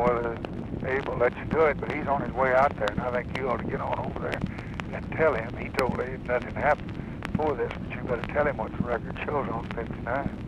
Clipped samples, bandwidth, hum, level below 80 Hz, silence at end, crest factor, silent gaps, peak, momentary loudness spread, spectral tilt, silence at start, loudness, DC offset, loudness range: under 0.1%; 13 kHz; none; -42 dBFS; 0 s; 16 dB; none; -12 dBFS; 9 LU; -7.5 dB/octave; 0 s; -28 LUFS; under 0.1%; 3 LU